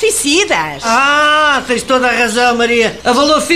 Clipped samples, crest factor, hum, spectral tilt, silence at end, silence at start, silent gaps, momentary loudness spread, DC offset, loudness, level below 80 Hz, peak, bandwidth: under 0.1%; 12 dB; none; -2 dB/octave; 0 s; 0 s; none; 5 LU; 0.6%; -11 LUFS; -42 dBFS; 0 dBFS; 15.5 kHz